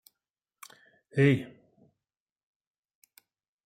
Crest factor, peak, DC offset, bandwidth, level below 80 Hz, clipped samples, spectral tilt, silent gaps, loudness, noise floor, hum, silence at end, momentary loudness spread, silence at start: 24 dB; -10 dBFS; under 0.1%; 16 kHz; -70 dBFS; under 0.1%; -7.5 dB/octave; none; -27 LUFS; under -90 dBFS; none; 2.2 s; 27 LU; 1.15 s